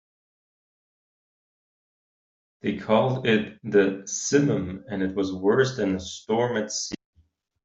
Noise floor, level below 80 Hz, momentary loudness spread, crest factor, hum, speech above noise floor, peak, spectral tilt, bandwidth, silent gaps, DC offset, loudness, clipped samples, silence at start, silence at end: -65 dBFS; -62 dBFS; 9 LU; 20 dB; none; 41 dB; -6 dBFS; -5 dB/octave; 8 kHz; none; under 0.1%; -25 LUFS; under 0.1%; 2.65 s; 0.7 s